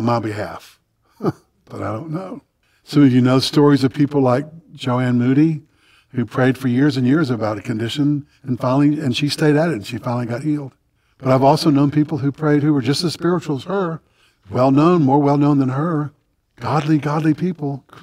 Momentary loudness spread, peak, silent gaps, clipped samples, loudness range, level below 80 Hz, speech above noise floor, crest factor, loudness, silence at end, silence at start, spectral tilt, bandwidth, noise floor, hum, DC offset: 14 LU; -2 dBFS; none; under 0.1%; 3 LU; -60 dBFS; 26 dB; 16 dB; -18 LUFS; 0.05 s; 0 s; -7 dB/octave; 14.5 kHz; -43 dBFS; none; under 0.1%